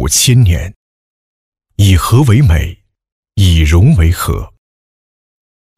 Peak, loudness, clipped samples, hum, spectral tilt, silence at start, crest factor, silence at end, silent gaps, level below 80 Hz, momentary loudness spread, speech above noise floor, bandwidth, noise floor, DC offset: 0 dBFS; -10 LUFS; under 0.1%; none; -5 dB/octave; 0 s; 12 dB; 1.3 s; 0.76-1.52 s, 3.12-3.23 s; -20 dBFS; 14 LU; over 82 dB; 16 kHz; under -90 dBFS; under 0.1%